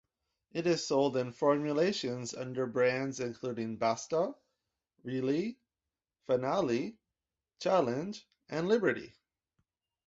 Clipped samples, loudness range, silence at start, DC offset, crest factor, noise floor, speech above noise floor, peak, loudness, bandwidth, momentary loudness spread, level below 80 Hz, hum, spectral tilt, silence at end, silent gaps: under 0.1%; 4 LU; 0.55 s; under 0.1%; 18 dB; under -90 dBFS; over 58 dB; -14 dBFS; -33 LUFS; 8 kHz; 11 LU; -74 dBFS; none; -5 dB/octave; 1 s; none